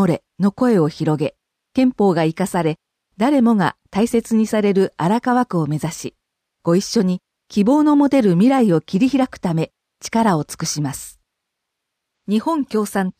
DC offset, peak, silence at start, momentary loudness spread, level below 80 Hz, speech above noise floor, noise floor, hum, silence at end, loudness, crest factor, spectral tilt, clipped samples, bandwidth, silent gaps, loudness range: under 0.1%; -4 dBFS; 0 s; 12 LU; -56 dBFS; 62 dB; -79 dBFS; none; 0.1 s; -18 LUFS; 14 dB; -6.5 dB/octave; under 0.1%; 15.5 kHz; none; 5 LU